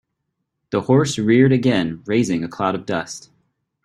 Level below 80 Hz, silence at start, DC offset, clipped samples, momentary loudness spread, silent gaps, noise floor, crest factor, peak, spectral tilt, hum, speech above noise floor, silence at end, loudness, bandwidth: -56 dBFS; 0.7 s; under 0.1%; under 0.1%; 11 LU; none; -76 dBFS; 18 dB; -2 dBFS; -6 dB/octave; none; 58 dB; 0.65 s; -19 LUFS; 12 kHz